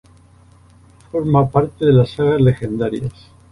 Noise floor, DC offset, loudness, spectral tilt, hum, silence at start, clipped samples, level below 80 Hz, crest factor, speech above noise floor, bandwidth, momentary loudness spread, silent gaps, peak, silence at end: -48 dBFS; under 0.1%; -17 LUFS; -9 dB/octave; none; 1.15 s; under 0.1%; -42 dBFS; 16 dB; 32 dB; 11 kHz; 11 LU; none; -2 dBFS; 0.4 s